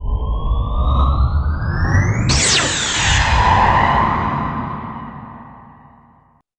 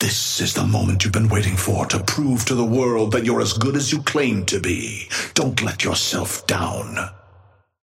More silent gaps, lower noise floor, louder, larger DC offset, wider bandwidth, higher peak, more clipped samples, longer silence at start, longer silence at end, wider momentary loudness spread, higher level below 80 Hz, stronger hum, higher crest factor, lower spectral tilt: neither; about the same, -53 dBFS vs -52 dBFS; first, -16 LUFS vs -20 LUFS; neither; second, 10.5 kHz vs 16.5 kHz; about the same, -2 dBFS vs -4 dBFS; neither; about the same, 0 s vs 0 s; first, 0.95 s vs 0.65 s; first, 15 LU vs 6 LU; first, -22 dBFS vs -46 dBFS; neither; about the same, 16 dB vs 18 dB; about the same, -3.5 dB/octave vs -4 dB/octave